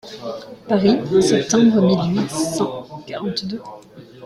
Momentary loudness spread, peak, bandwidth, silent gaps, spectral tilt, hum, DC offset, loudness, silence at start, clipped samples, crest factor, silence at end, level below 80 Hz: 17 LU; -4 dBFS; 13 kHz; none; -5.5 dB/octave; none; under 0.1%; -18 LUFS; 0.05 s; under 0.1%; 16 dB; 0 s; -54 dBFS